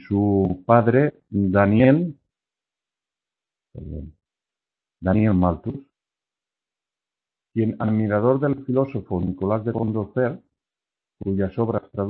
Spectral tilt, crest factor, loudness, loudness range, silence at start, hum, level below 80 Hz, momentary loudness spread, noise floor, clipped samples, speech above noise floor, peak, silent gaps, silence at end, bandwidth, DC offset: -12.5 dB/octave; 22 dB; -21 LUFS; 6 LU; 0.1 s; none; -48 dBFS; 16 LU; -90 dBFS; under 0.1%; 69 dB; -2 dBFS; none; 0 s; 4.3 kHz; under 0.1%